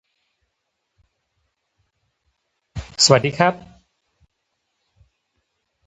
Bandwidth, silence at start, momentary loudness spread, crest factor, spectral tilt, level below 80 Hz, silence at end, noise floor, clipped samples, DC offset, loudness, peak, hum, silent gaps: 9 kHz; 2.75 s; 23 LU; 26 dB; -3 dB/octave; -50 dBFS; 2.3 s; -76 dBFS; under 0.1%; under 0.1%; -16 LUFS; 0 dBFS; none; none